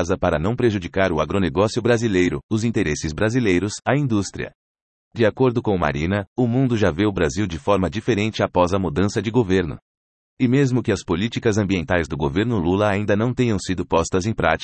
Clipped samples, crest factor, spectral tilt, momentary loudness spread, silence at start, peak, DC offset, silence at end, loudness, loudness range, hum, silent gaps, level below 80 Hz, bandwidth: under 0.1%; 18 dB; -6 dB/octave; 4 LU; 0 s; -4 dBFS; under 0.1%; 0 s; -21 LUFS; 1 LU; none; 2.43-2.49 s, 4.55-4.75 s, 4.82-5.11 s, 6.27-6.36 s, 9.82-10.37 s; -44 dBFS; 8.8 kHz